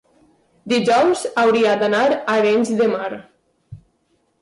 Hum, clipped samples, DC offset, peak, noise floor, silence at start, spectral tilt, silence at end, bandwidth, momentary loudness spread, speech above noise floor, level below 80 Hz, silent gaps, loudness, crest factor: none; under 0.1%; under 0.1%; -8 dBFS; -65 dBFS; 0.65 s; -4.5 dB/octave; 0.65 s; 11.5 kHz; 7 LU; 48 dB; -60 dBFS; none; -17 LUFS; 12 dB